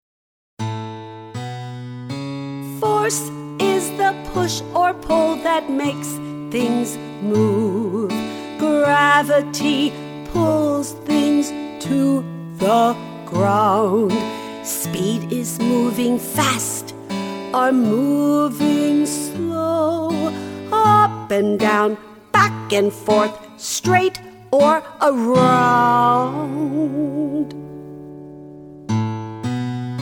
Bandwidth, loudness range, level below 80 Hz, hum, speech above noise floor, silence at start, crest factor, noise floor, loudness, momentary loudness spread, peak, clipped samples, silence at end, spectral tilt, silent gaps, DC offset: 19 kHz; 5 LU; -52 dBFS; none; over 73 dB; 0.6 s; 16 dB; under -90 dBFS; -19 LUFS; 14 LU; -2 dBFS; under 0.1%; 0 s; -5 dB/octave; none; under 0.1%